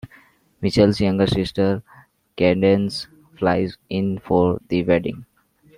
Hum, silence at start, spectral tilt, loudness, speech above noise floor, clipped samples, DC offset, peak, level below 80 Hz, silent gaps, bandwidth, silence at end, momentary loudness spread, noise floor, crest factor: none; 0.05 s; -7 dB/octave; -20 LUFS; 34 dB; under 0.1%; under 0.1%; -2 dBFS; -48 dBFS; none; 11.5 kHz; 0.55 s; 12 LU; -53 dBFS; 18 dB